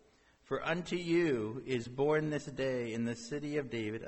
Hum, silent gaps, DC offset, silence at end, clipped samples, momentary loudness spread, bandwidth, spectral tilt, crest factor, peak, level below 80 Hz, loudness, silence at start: none; none; under 0.1%; 0 s; under 0.1%; 7 LU; 8.4 kHz; -6 dB/octave; 16 dB; -20 dBFS; -64 dBFS; -35 LUFS; 0.5 s